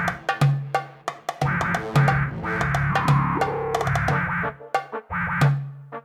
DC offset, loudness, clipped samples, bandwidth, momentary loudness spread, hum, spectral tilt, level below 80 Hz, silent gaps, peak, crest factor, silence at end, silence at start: under 0.1%; -23 LUFS; under 0.1%; 13.5 kHz; 9 LU; none; -6.5 dB/octave; -42 dBFS; none; -6 dBFS; 16 dB; 0.05 s; 0 s